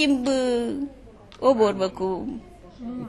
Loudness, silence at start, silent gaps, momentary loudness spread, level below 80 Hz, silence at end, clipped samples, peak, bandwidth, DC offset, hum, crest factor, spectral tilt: -24 LUFS; 0 s; none; 16 LU; -50 dBFS; 0 s; under 0.1%; -6 dBFS; 11 kHz; under 0.1%; none; 18 dB; -5 dB/octave